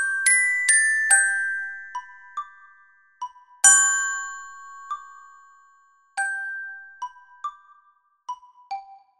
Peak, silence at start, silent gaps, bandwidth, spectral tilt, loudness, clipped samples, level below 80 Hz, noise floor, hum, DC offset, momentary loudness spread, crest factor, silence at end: 0 dBFS; 0 s; none; 16 kHz; 6 dB/octave; -18 LUFS; under 0.1%; -72 dBFS; -62 dBFS; none; under 0.1%; 22 LU; 24 dB; 0.25 s